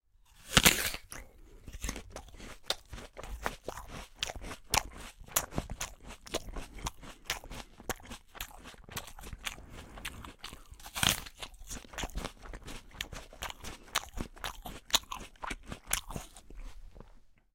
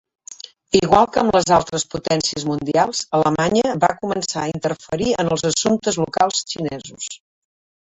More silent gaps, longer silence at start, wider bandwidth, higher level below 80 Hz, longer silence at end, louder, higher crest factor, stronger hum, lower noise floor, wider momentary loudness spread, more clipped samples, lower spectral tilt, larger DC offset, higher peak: neither; second, 0.15 s vs 0.3 s; first, 17 kHz vs 8.4 kHz; about the same, -48 dBFS vs -48 dBFS; second, 0.2 s vs 0.75 s; second, -35 LUFS vs -19 LUFS; first, 36 dB vs 18 dB; neither; first, -57 dBFS vs -40 dBFS; first, 19 LU vs 15 LU; neither; second, -1.5 dB/octave vs -4 dB/octave; neither; about the same, -2 dBFS vs -2 dBFS